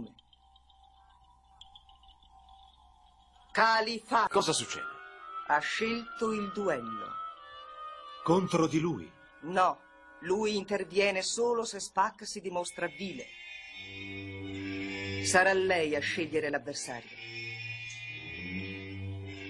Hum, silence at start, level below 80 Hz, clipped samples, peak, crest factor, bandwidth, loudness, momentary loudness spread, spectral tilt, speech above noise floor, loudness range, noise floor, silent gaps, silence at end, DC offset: none; 0 s; -66 dBFS; under 0.1%; -10 dBFS; 22 dB; 12 kHz; -32 LUFS; 16 LU; -3.5 dB/octave; 32 dB; 5 LU; -62 dBFS; none; 0 s; under 0.1%